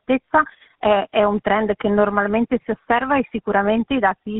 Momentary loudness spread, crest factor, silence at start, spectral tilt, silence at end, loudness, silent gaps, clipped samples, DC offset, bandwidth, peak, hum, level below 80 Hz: 3 LU; 16 dB; 0.1 s; -4 dB/octave; 0 s; -19 LUFS; none; under 0.1%; under 0.1%; 4 kHz; -4 dBFS; none; -48 dBFS